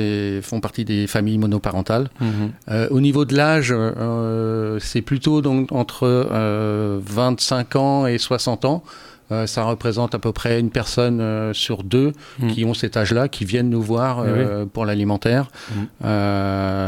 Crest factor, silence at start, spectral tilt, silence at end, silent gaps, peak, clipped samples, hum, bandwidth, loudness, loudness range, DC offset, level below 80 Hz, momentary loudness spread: 18 dB; 0 s; -6 dB/octave; 0 s; none; -2 dBFS; under 0.1%; none; 16.5 kHz; -20 LUFS; 2 LU; under 0.1%; -46 dBFS; 6 LU